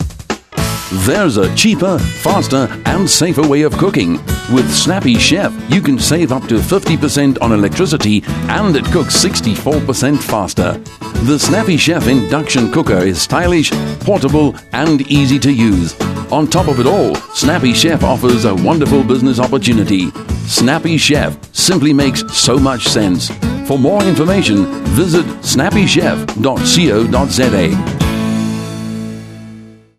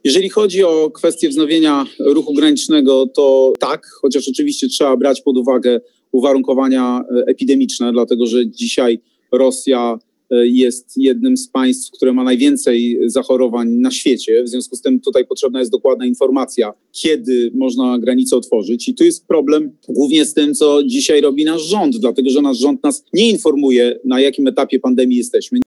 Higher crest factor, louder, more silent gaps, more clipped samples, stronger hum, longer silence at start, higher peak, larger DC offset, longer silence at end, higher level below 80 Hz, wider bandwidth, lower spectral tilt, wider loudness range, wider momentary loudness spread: about the same, 12 dB vs 12 dB; about the same, -12 LUFS vs -14 LUFS; neither; neither; neither; about the same, 0 s vs 0.05 s; about the same, 0 dBFS vs -2 dBFS; first, 0.1% vs under 0.1%; first, 0.25 s vs 0.05 s; first, -30 dBFS vs -68 dBFS; first, 14.5 kHz vs 12.5 kHz; about the same, -4.5 dB/octave vs -3.5 dB/octave; about the same, 1 LU vs 2 LU; about the same, 7 LU vs 5 LU